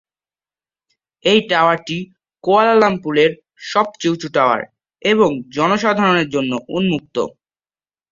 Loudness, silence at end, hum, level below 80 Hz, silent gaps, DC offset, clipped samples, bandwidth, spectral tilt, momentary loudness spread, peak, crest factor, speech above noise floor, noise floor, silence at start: -17 LUFS; 0.85 s; none; -58 dBFS; none; under 0.1%; under 0.1%; 7.6 kHz; -5 dB/octave; 12 LU; -2 dBFS; 16 dB; over 74 dB; under -90 dBFS; 1.25 s